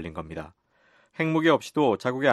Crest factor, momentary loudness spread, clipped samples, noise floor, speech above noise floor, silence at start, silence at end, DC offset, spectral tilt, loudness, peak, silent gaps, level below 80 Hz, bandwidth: 20 dB; 19 LU; under 0.1%; -63 dBFS; 38 dB; 0 s; 0 s; under 0.1%; -6 dB/octave; -24 LUFS; -6 dBFS; none; -58 dBFS; 12.5 kHz